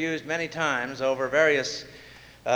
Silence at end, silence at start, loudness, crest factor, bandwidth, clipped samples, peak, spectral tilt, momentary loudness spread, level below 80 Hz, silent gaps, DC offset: 0 s; 0 s; -25 LUFS; 18 dB; over 20 kHz; under 0.1%; -8 dBFS; -3.5 dB/octave; 15 LU; -62 dBFS; none; under 0.1%